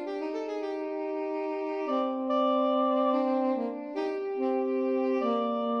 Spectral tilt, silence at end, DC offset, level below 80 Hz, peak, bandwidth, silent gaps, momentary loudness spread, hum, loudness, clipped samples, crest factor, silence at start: -6 dB/octave; 0 s; under 0.1%; -82 dBFS; -16 dBFS; 6.6 kHz; none; 8 LU; none; -29 LUFS; under 0.1%; 14 dB; 0 s